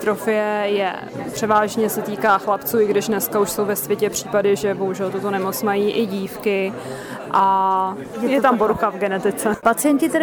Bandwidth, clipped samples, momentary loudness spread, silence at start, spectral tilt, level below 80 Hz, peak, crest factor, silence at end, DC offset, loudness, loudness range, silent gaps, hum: over 20 kHz; under 0.1%; 7 LU; 0 s; -4.5 dB/octave; -56 dBFS; -4 dBFS; 16 dB; 0 s; under 0.1%; -20 LUFS; 2 LU; none; none